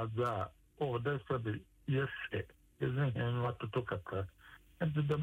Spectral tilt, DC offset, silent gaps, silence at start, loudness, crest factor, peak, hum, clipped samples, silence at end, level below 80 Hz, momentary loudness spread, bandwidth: -8.5 dB/octave; under 0.1%; none; 0 s; -38 LUFS; 14 dB; -22 dBFS; none; under 0.1%; 0 s; -62 dBFS; 8 LU; 9.4 kHz